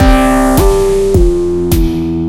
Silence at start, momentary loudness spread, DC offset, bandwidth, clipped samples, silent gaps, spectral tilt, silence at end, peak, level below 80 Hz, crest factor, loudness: 0 s; 4 LU; under 0.1%; 17 kHz; 0.5%; none; -6.5 dB/octave; 0 s; 0 dBFS; -14 dBFS; 10 dB; -11 LUFS